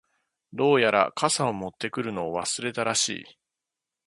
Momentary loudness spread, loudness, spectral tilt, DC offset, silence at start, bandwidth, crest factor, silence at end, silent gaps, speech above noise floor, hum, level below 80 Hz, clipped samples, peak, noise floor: 11 LU; -25 LUFS; -3 dB/octave; under 0.1%; 0.55 s; 11.5 kHz; 24 dB; 0.85 s; none; 62 dB; none; -66 dBFS; under 0.1%; -4 dBFS; -87 dBFS